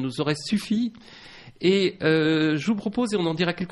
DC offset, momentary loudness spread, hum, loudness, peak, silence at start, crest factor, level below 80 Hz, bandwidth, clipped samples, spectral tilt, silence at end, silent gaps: under 0.1%; 6 LU; none; -24 LUFS; -8 dBFS; 0 s; 16 dB; -60 dBFS; 11.5 kHz; under 0.1%; -6 dB/octave; 0 s; none